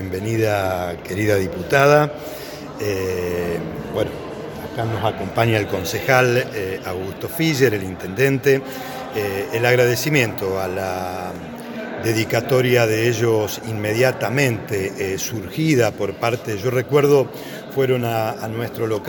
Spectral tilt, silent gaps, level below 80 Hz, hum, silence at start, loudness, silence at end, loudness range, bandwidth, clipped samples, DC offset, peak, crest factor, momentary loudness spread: -5.5 dB/octave; none; -50 dBFS; none; 0 s; -20 LUFS; 0 s; 2 LU; 17.5 kHz; under 0.1%; under 0.1%; 0 dBFS; 20 dB; 11 LU